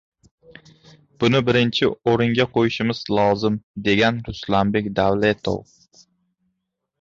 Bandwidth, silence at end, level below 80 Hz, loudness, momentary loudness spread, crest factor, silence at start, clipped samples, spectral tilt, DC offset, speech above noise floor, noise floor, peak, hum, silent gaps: 7.6 kHz; 1.4 s; -48 dBFS; -20 LUFS; 7 LU; 18 dB; 1.2 s; under 0.1%; -6.5 dB/octave; under 0.1%; 57 dB; -77 dBFS; -4 dBFS; none; 3.63-3.74 s